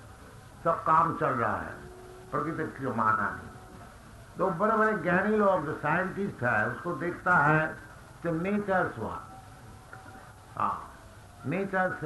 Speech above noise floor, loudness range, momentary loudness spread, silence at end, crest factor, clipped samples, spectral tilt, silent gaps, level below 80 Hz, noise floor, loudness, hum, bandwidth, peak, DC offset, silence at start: 22 dB; 7 LU; 23 LU; 0 s; 20 dB; under 0.1%; -7.5 dB/octave; none; -56 dBFS; -50 dBFS; -28 LUFS; none; 12 kHz; -10 dBFS; under 0.1%; 0 s